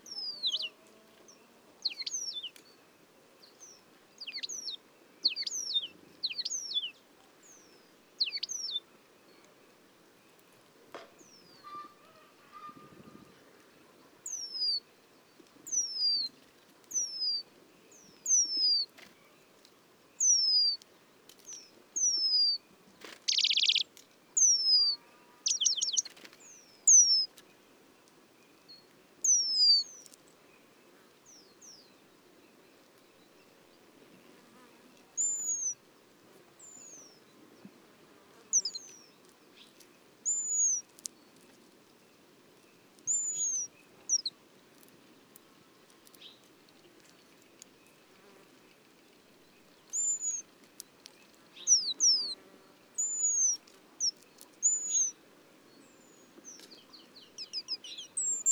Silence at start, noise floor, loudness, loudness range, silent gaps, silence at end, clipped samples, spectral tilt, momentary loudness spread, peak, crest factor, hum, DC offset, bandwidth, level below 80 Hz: 0.05 s; -62 dBFS; -28 LUFS; 13 LU; none; 0 s; under 0.1%; 3 dB/octave; 26 LU; -10 dBFS; 24 dB; none; under 0.1%; over 20 kHz; -90 dBFS